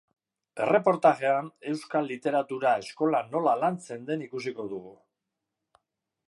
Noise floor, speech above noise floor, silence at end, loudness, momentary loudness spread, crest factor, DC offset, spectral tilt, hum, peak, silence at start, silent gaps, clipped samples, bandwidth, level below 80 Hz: -85 dBFS; 58 dB; 1.35 s; -27 LUFS; 13 LU; 20 dB; under 0.1%; -6 dB/octave; none; -8 dBFS; 0.55 s; none; under 0.1%; 11.5 kHz; -80 dBFS